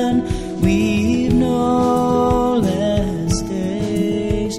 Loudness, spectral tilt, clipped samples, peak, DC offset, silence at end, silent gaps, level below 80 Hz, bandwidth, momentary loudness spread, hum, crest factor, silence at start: -18 LUFS; -6.5 dB/octave; under 0.1%; -2 dBFS; 0.1%; 0 s; none; -32 dBFS; 14 kHz; 5 LU; none; 14 dB; 0 s